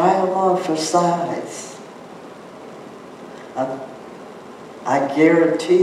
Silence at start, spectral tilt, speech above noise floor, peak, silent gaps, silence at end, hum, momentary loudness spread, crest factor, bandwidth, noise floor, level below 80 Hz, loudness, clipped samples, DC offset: 0 s; -5 dB/octave; 20 dB; -4 dBFS; none; 0 s; none; 22 LU; 16 dB; 13 kHz; -38 dBFS; -72 dBFS; -19 LUFS; under 0.1%; under 0.1%